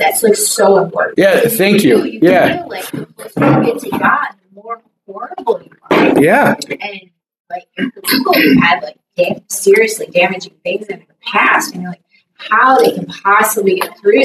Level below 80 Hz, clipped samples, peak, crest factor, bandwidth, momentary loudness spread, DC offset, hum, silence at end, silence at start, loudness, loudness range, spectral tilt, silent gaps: -54 dBFS; under 0.1%; 0 dBFS; 12 dB; 16 kHz; 17 LU; under 0.1%; none; 0 s; 0 s; -12 LUFS; 3 LU; -4 dB/octave; 7.40-7.45 s